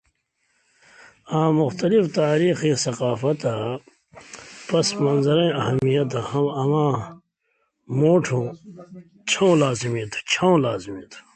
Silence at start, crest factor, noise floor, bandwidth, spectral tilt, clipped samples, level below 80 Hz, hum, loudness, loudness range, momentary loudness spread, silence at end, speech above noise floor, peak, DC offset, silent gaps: 1.3 s; 16 dB; -71 dBFS; 9.2 kHz; -5.5 dB/octave; under 0.1%; -60 dBFS; none; -21 LUFS; 2 LU; 18 LU; 0.15 s; 50 dB; -6 dBFS; under 0.1%; none